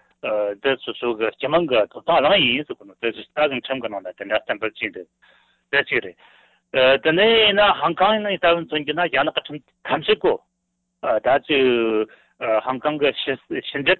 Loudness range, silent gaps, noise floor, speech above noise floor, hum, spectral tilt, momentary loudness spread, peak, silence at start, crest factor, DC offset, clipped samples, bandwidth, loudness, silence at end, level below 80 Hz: 7 LU; none; -75 dBFS; 54 dB; none; -7.5 dB/octave; 12 LU; -6 dBFS; 0.25 s; 16 dB; under 0.1%; under 0.1%; 4.4 kHz; -20 LUFS; 0.05 s; -56 dBFS